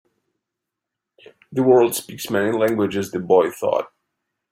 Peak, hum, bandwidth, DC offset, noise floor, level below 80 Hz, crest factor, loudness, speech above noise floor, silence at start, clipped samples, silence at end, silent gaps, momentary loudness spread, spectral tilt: -2 dBFS; none; 16 kHz; under 0.1%; -83 dBFS; -64 dBFS; 18 dB; -19 LUFS; 64 dB; 1.5 s; under 0.1%; 0.65 s; none; 11 LU; -5 dB/octave